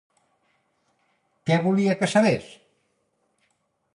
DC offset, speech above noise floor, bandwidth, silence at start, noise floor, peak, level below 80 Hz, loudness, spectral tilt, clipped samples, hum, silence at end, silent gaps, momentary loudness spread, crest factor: under 0.1%; 50 dB; 11.5 kHz; 1.45 s; -71 dBFS; -6 dBFS; -66 dBFS; -22 LUFS; -6 dB/octave; under 0.1%; none; 1.5 s; none; 8 LU; 20 dB